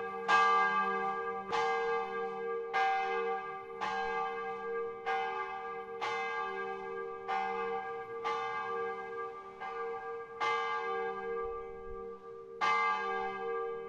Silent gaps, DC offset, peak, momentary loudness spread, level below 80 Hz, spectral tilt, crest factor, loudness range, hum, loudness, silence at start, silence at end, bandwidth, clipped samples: none; under 0.1%; -16 dBFS; 12 LU; -66 dBFS; -3.5 dB/octave; 20 dB; 5 LU; none; -35 LUFS; 0 s; 0 s; 8.8 kHz; under 0.1%